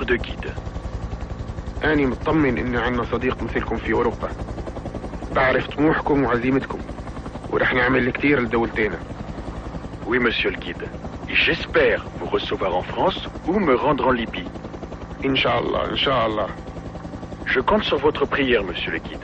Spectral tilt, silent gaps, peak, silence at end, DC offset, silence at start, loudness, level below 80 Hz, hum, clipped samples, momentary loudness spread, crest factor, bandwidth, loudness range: -6.5 dB/octave; none; -4 dBFS; 0 s; under 0.1%; 0 s; -22 LUFS; -36 dBFS; none; under 0.1%; 14 LU; 18 dB; 9 kHz; 3 LU